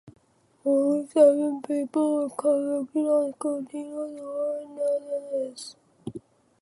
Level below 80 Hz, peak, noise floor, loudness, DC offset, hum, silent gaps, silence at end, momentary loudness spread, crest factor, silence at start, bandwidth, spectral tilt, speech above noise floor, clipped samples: -74 dBFS; -6 dBFS; -55 dBFS; -26 LUFS; under 0.1%; none; none; 0.45 s; 21 LU; 20 dB; 0.05 s; 11.5 kHz; -6 dB/octave; 30 dB; under 0.1%